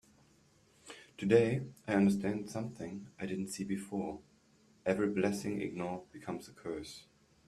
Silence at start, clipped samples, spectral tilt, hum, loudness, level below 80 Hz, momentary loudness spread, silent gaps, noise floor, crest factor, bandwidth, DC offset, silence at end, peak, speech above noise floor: 0.85 s; under 0.1%; -6.5 dB/octave; none; -35 LUFS; -68 dBFS; 16 LU; none; -67 dBFS; 24 dB; 13.5 kHz; under 0.1%; 0.45 s; -12 dBFS; 33 dB